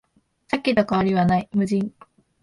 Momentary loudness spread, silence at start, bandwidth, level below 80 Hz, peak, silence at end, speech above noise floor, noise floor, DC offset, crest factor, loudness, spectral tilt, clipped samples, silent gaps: 7 LU; 0.5 s; 11.5 kHz; -52 dBFS; -6 dBFS; 0.55 s; 34 dB; -55 dBFS; under 0.1%; 18 dB; -22 LUFS; -7.5 dB/octave; under 0.1%; none